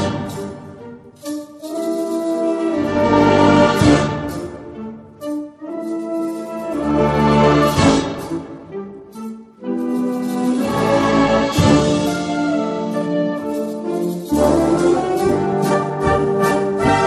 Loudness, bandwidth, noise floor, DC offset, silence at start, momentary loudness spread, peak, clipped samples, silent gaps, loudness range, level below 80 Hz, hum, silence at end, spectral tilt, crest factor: -17 LUFS; 13.5 kHz; -37 dBFS; under 0.1%; 0 s; 18 LU; 0 dBFS; under 0.1%; none; 5 LU; -38 dBFS; none; 0 s; -6 dB/octave; 16 dB